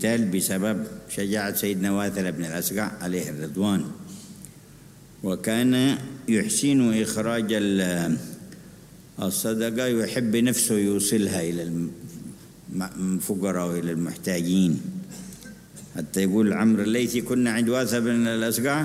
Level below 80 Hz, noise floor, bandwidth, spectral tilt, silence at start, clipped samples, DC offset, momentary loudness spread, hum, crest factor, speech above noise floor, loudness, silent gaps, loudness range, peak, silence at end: -58 dBFS; -48 dBFS; 16 kHz; -4.5 dB/octave; 0 s; under 0.1%; under 0.1%; 18 LU; none; 16 dB; 24 dB; -24 LUFS; none; 4 LU; -8 dBFS; 0 s